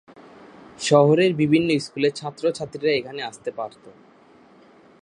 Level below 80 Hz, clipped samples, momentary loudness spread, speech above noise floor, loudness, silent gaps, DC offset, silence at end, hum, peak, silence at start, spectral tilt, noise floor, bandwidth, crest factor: -64 dBFS; under 0.1%; 15 LU; 31 dB; -21 LUFS; none; under 0.1%; 1.15 s; none; -2 dBFS; 0.8 s; -5.5 dB/octave; -52 dBFS; 11 kHz; 20 dB